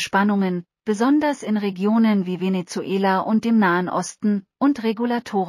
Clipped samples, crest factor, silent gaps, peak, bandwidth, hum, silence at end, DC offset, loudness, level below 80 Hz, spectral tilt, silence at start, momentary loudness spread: under 0.1%; 14 dB; none; -6 dBFS; 12.5 kHz; none; 0 s; under 0.1%; -21 LUFS; -68 dBFS; -6 dB/octave; 0 s; 7 LU